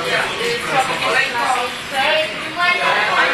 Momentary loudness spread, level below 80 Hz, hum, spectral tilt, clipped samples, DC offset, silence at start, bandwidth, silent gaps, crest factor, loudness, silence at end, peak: 5 LU; -54 dBFS; none; -2 dB/octave; under 0.1%; under 0.1%; 0 s; 14 kHz; none; 14 dB; -17 LUFS; 0 s; -4 dBFS